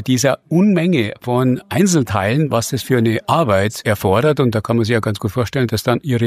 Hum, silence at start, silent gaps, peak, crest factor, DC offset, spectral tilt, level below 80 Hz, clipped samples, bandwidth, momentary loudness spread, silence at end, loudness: none; 0 s; none; -2 dBFS; 14 dB; under 0.1%; -6 dB/octave; -50 dBFS; under 0.1%; 15.5 kHz; 4 LU; 0 s; -16 LUFS